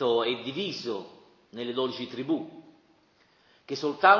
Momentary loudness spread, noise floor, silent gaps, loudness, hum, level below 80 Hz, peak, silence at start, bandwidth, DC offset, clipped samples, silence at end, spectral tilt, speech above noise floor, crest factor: 18 LU; -64 dBFS; none; -31 LUFS; none; -78 dBFS; -6 dBFS; 0 s; 7.2 kHz; under 0.1%; under 0.1%; 0 s; -5 dB/octave; 37 dB; 24 dB